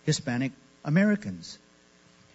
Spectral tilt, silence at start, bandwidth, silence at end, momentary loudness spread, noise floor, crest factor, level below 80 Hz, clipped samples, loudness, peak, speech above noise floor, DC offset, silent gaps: -5.5 dB/octave; 0.05 s; 8 kHz; 0.8 s; 19 LU; -59 dBFS; 18 dB; -66 dBFS; under 0.1%; -27 LUFS; -12 dBFS; 32 dB; under 0.1%; none